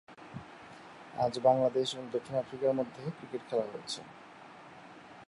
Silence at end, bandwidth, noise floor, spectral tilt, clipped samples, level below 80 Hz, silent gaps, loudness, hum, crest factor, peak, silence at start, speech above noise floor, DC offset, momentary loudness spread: 0.05 s; 11.5 kHz; -52 dBFS; -5.5 dB/octave; under 0.1%; -74 dBFS; none; -33 LUFS; none; 22 dB; -12 dBFS; 0.1 s; 20 dB; under 0.1%; 23 LU